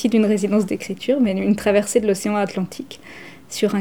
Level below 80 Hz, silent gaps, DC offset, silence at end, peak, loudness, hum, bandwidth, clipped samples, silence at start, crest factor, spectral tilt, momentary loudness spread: -54 dBFS; none; 0.4%; 0 s; -4 dBFS; -20 LUFS; none; 18.5 kHz; under 0.1%; 0 s; 16 dB; -5.5 dB/octave; 18 LU